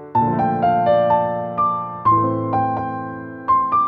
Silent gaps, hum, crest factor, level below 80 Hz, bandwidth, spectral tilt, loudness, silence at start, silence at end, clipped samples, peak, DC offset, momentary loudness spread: none; none; 12 dB; -52 dBFS; 5.2 kHz; -10 dB/octave; -19 LUFS; 0 s; 0 s; under 0.1%; -6 dBFS; under 0.1%; 10 LU